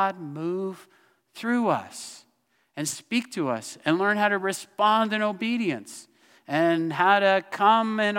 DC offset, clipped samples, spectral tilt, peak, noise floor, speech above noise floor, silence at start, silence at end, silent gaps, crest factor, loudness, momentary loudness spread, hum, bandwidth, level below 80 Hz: under 0.1%; under 0.1%; -4 dB/octave; -6 dBFS; -69 dBFS; 45 dB; 0 s; 0 s; none; 18 dB; -25 LUFS; 15 LU; none; 16.5 kHz; -82 dBFS